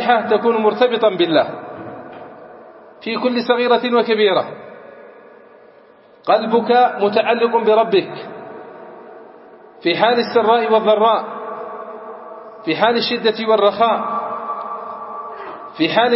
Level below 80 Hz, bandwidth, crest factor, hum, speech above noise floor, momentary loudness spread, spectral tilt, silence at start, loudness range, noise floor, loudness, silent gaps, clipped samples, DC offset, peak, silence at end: -70 dBFS; 5.8 kHz; 18 dB; none; 32 dB; 20 LU; -9 dB/octave; 0 s; 2 LU; -47 dBFS; -16 LUFS; none; under 0.1%; under 0.1%; 0 dBFS; 0 s